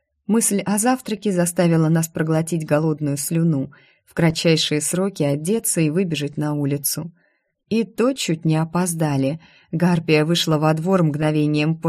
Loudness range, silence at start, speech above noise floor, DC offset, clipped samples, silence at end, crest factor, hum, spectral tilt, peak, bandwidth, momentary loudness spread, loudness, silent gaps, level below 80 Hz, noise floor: 3 LU; 0.3 s; 46 dB; under 0.1%; under 0.1%; 0 s; 16 dB; none; -5 dB/octave; -4 dBFS; 15.5 kHz; 6 LU; -20 LUFS; none; -58 dBFS; -66 dBFS